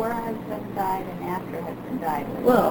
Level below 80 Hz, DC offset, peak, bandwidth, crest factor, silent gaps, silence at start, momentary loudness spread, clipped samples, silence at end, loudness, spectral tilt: -52 dBFS; under 0.1%; -6 dBFS; over 20 kHz; 20 dB; none; 0 s; 11 LU; under 0.1%; 0 s; -27 LUFS; -7 dB/octave